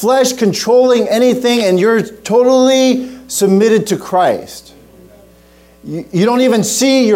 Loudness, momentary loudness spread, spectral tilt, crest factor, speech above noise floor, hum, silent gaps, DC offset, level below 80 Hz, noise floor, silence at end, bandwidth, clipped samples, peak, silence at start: -12 LUFS; 10 LU; -4.5 dB/octave; 10 dB; 33 dB; none; none; under 0.1%; -52 dBFS; -44 dBFS; 0 s; 16.5 kHz; under 0.1%; -2 dBFS; 0 s